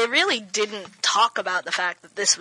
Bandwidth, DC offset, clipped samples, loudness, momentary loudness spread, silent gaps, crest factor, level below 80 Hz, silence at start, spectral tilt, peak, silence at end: 11.5 kHz; under 0.1%; under 0.1%; -22 LUFS; 6 LU; none; 18 dB; -86 dBFS; 0 s; 0.5 dB/octave; -6 dBFS; 0 s